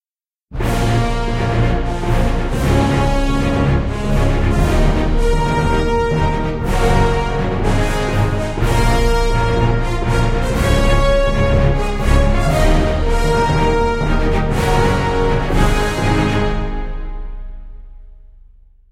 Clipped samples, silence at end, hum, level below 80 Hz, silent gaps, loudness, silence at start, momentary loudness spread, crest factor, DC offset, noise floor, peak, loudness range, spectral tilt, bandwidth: under 0.1%; 0.65 s; none; -18 dBFS; none; -17 LUFS; 0.5 s; 4 LU; 14 dB; under 0.1%; under -90 dBFS; -2 dBFS; 2 LU; -6.5 dB/octave; 14 kHz